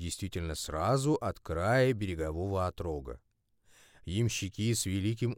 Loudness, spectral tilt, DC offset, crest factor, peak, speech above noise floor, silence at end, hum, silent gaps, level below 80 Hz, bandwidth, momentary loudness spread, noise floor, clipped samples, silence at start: -32 LUFS; -5.5 dB/octave; under 0.1%; 16 dB; -16 dBFS; 35 dB; 0 s; none; none; -50 dBFS; 17 kHz; 11 LU; -67 dBFS; under 0.1%; 0 s